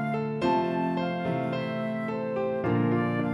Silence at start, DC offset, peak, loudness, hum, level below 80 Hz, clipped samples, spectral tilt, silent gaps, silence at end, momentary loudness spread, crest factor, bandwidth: 0 s; under 0.1%; -14 dBFS; -28 LUFS; none; -62 dBFS; under 0.1%; -8.5 dB/octave; none; 0 s; 5 LU; 14 dB; 11 kHz